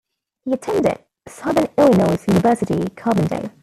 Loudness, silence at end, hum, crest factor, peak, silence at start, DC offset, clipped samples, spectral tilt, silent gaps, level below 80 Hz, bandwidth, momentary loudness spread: -18 LUFS; 0.15 s; none; 16 dB; -2 dBFS; 0.45 s; under 0.1%; under 0.1%; -7 dB/octave; none; -50 dBFS; 14.5 kHz; 11 LU